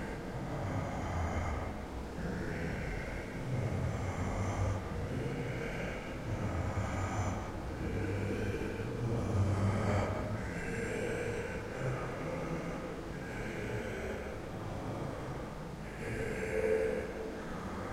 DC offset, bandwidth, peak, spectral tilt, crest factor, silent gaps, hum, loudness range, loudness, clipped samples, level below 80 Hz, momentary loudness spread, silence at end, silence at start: under 0.1%; 15.5 kHz; -20 dBFS; -6.5 dB/octave; 16 dB; none; none; 5 LU; -37 LUFS; under 0.1%; -46 dBFS; 8 LU; 0 s; 0 s